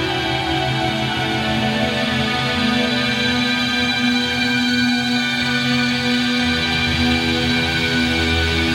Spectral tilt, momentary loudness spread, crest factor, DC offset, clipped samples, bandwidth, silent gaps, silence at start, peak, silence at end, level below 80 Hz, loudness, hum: -4 dB/octave; 3 LU; 12 dB; under 0.1%; under 0.1%; 16.5 kHz; none; 0 s; -6 dBFS; 0 s; -36 dBFS; -17 LUFS; none